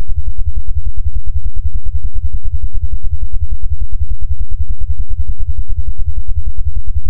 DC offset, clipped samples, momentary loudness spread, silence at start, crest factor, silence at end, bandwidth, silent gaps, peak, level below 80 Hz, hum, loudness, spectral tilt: 50%; 0.2%; 1 LU; 0 s; 8 dB; 0 s; 0.2 kHz; none; 0 dBFS; -18 dBFS; none; -23 LUFS; -18 dB/octave